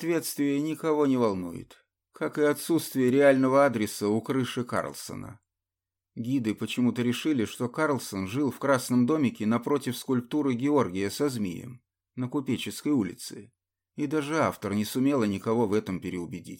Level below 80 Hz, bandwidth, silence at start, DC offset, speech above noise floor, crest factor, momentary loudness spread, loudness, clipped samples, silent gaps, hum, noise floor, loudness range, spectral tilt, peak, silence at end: -68 dBFS; 17 kHz; 0 s; under 0.1%; 62 dB; 18 dB; 13 LU; -27 LUFS; under 0.1%; none; none; -89 dBFS; 5 LU; -5.5 dB/octave; -10 dBFS; 0 s